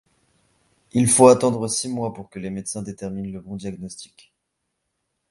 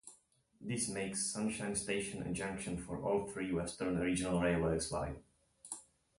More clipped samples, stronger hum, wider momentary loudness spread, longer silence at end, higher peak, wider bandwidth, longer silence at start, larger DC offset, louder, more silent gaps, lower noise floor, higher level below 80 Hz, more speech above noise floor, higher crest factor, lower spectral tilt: neither; neither; first, 20 LU vs 14 LU; first, 1.25 s vs 0.35 s; first, 0 dBFS vs -22 dBFS; about the same, 11.5 kHz vs 11.5 kHz; first, 0.95 s vs 0.05 s; neither; first, -20 LUFS vs -37 LUFS; neither; first, -77 dBFS vs -69 dBFS; about the same, -56 dBFS vs -56 dBFS; first, 56 dB vs 32 dB; about the same, 22 dB vs 18 dB; about the same, -5 dB/octave vs -4.5 dB/octave